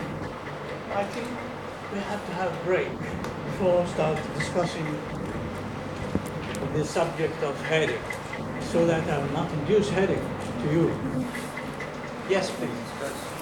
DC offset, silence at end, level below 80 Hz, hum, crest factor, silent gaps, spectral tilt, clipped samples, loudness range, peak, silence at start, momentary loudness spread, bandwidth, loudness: under 0.1%; 0 s; -50 dBFS; none; 18 dB; none; -6 dB/octave; under 0.1%; 4 LU; -10 dBFS; 0 s; 10 LU; 17 kHz; -28 LUFS